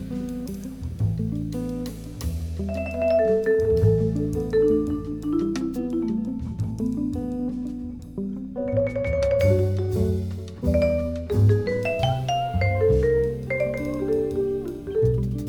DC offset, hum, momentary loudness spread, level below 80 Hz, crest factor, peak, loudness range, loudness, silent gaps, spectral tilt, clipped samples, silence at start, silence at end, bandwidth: under 0.1%; none; 11 LU; -36 dBFS; 16 dB; -8 dBFS; 5 LU; -24 LUFS; none; -8 dB/octave; under 0.1%; 0 s; 0 s; 18.5 kHz